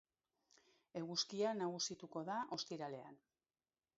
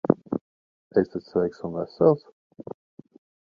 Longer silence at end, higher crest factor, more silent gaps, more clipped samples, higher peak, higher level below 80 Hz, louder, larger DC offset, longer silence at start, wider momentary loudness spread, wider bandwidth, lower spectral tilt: second, 0.8 s vs 1.25 s; second, 20 dB vs 26 dB; second, none vs 0.41-0.90 s; neither; second, -28 dBFS vs 0 dBFS; second, -88 dBFS vs -62 dBFS; second, -44 LUFS vs -25 LUFS; neither; first, 0.95 s vs 0.1 s; second, 12 LU vs 21 LU; first, 7.6 kHz vs 6.6 kHz; second, -3 dB/octave vs -10 dB/octave